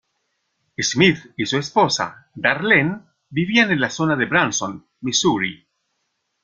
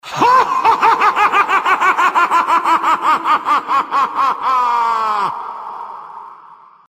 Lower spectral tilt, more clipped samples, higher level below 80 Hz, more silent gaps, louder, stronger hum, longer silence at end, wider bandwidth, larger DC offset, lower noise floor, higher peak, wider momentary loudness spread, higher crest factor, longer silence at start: about the same, -3.5 dB/octave vs -2.5 dB/octave; neither; about the same, -58 dBFS vs -58 dBFS; neither; second, -19 LUFS vs -13 LUFS; neither; first, 0.9 s vs 0.35 s; second, 10 kHz vs 15.5 kHz; neither; first, -73 dBFS vs -42 dBFS; about the same, 0 dBFS vs 0 dBFS; second, 12 LU vs 16 LU; first, 20 dB vs 14 dB; first, 0.8 s vs 0.05 s